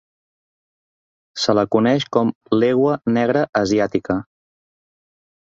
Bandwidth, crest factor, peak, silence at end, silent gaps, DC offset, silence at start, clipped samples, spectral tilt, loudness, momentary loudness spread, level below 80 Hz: 7.8 kHz; 18 dB; -2 dBFS; 1.4 s; 2.35-2.41 s, 3.49-3.53 s; under 0.1%; 1.35 s; under 0.1%; -6 dB/octave; -18 LUFS; 6 LU; -56 dBFS